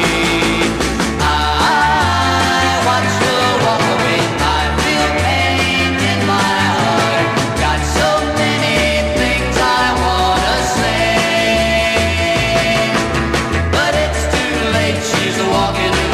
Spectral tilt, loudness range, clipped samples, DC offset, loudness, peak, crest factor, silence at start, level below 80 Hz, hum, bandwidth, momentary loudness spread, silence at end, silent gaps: -4 dB/octave; 1 LU; under 0.1%; under 0.1%; -14 LUFS; -2 dBFS; 12 dB; 0 s; -26 dBFS; none; 15.5 kHz; 3 LU; 0 s; none